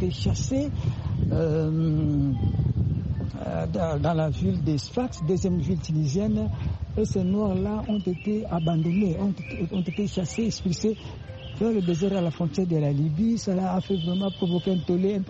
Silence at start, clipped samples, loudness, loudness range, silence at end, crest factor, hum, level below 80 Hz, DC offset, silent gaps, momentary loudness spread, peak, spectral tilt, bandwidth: 0 s; under 0.1%; -26 LUFS; 2 LU; 0 s; 12 dB; none; -40 dBFS; under 0.1%; none; 5 LU; -12 dBFS; -7.5 dB/octave; 8.2 kHz